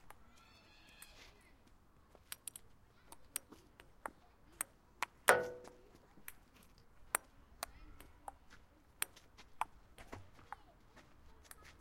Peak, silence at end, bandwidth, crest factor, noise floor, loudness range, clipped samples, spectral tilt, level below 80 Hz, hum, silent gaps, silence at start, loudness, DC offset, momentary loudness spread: -6 dBFS; 0.1 s; 16 kHz; 40 dB; -66 dBFS; 13 LU; under 0.1%; -1.5 dB/octave; -68 dBFS; none; none; 0.05 s; -41 LUFS; under 0.1%; 24 LU